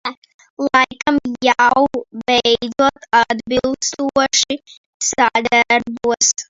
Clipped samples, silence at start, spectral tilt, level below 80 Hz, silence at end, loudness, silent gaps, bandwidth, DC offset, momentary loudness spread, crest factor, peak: under 0.1%; 0.05 s; -1.5 dB/octave; -50 dBFS; 0.05 s; -16 LUFS; 0.17-0.22 s, 0.34-0.39 s, 0.50-0.57 s, 4.77-5.00 s; 7.8 kHz; under 0.1%; 8 LU; 16 dB; 0 dBFS